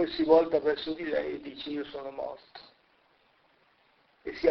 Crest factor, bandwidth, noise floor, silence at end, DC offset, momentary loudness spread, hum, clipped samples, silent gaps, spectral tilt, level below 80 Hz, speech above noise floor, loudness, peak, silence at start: 22 dB; 6 kHz; -67 dBFS; 0 s; under 0.1%; 22 LU; none; under 0.1%; none; -6.5 dB/octave; -62 dBFS; 38 dB; -29 LUFS; -8 dBFS; 0 s